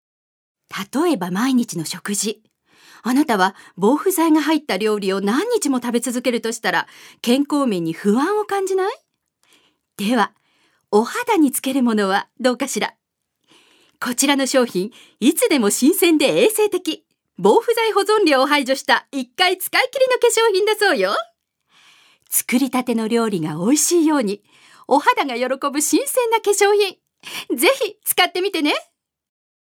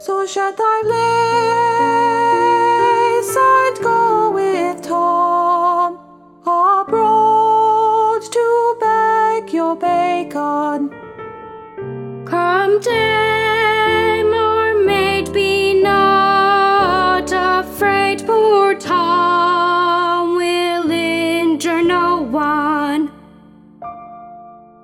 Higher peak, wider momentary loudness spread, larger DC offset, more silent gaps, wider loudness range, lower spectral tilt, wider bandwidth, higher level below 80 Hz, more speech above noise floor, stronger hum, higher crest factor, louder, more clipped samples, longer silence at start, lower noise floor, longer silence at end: about the same, 0 dBFS vs -2 dBFS; about the same, 10 LU vs 8 LU; neither; neither; about the same, 4 LU vs 4 LU; second, -3 dB/octave vs -4.5 dB/octave; first, 19 kHz vs 17 kHz; second, -78 dBFS vs -48 dBFS; first, 52 dB vs 28 dB; neither; first, 18 dB vs 12 dB; second, -18 LUFS vs -15 LUFS; neither; first, 0.7 s vs 0 s; first, -70 dBFS vs -43 dBFS; first, 0.95 s vs 0.25 s